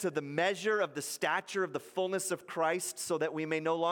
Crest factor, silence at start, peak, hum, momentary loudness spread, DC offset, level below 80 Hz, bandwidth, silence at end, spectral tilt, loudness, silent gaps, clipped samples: 18 dB; 0 s; -16 dBFS; none; 4 LU; under 0.1%; -84 dBFS; 17 kHz; 0 s; -3.5 dB/octave; -33 LUFS; none; under 0.1%